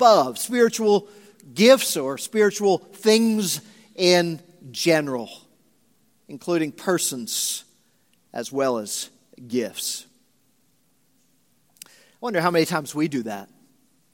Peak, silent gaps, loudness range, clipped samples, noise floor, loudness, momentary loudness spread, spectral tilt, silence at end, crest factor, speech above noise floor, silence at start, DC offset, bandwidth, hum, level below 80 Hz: 0 dBFS; none; 10 LU; under 0.1%; -66 dBFS; -22 LUFS; 16 LU; -3.5 dB/octave; 0.7 s; 22 dB; 44 dB; 0 s; under 0.1%; 17 kHz; none; -76 dBFS